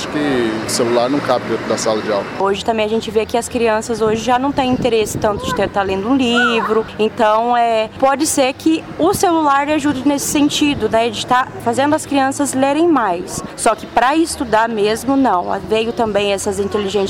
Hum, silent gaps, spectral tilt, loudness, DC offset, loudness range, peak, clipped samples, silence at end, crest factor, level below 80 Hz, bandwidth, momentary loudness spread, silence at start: none; none; -4 dB/octave; -16 LUFS; under 0.1%; 2 LU; -2 dBFS; under 0.1%; 0 s; 14 dB; -44 dBFS; 17 kHz; 4 LU; 0 s